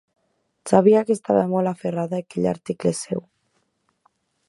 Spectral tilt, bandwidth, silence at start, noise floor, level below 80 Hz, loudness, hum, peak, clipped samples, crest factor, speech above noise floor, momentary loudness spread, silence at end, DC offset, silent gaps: -7 dB/octave; 11.5 kHz; 0.65 s; -70 dBFS; -62 dBFS; -21 LUFS; none; 0 dBFS; under 0.1%; 22 dB; 50 dB; 12 LU; 1.3 s; under 0.1%; none